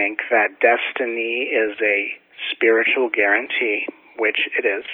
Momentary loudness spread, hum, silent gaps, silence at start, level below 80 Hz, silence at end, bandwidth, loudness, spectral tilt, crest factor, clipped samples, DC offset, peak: 7 LU; none; none; 0 s; -70 dBFS; 0 s; 4.2 kHz; -19 LUFS; -5 dB/octave; 18 dB; under 0.1%; under 0.1%; -2 dBFS